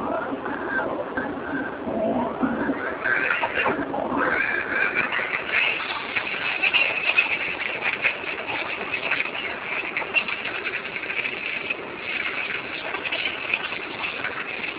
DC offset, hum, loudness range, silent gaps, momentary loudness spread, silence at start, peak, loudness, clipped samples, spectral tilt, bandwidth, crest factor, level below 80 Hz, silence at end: under 0.1%; none; 5 LU; none; 8 LU; 0 s; -6 dBFS; -24 LUFS; under 0.1%; -0.5 dB/octave; 4 kHz; 20 dB; -56 dBFS; 0 s